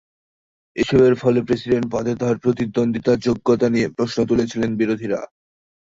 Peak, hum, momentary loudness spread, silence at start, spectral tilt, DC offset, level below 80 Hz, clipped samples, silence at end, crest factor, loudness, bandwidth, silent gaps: -4 dBFS; none; 8 LU; 0.75 s; -7 dB/octave; under 0.1%; -48 dBFS; under 0.1%; 0.6 s; 16 dB; -19 LUFS; 7.8 kHz; none